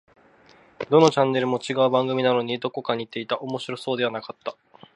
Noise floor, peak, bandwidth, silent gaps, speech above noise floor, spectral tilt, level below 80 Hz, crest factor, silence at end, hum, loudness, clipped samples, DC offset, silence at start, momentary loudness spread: -54 dBFS; -4 dBFS; 11 kHz; none; 32 dB; -5.5 dB/octave; -70 dBFS; 20 dB; 0.45 s; none; -23 LUFS; under 0.1%; under 0.1%; 0.8 s; 15 LU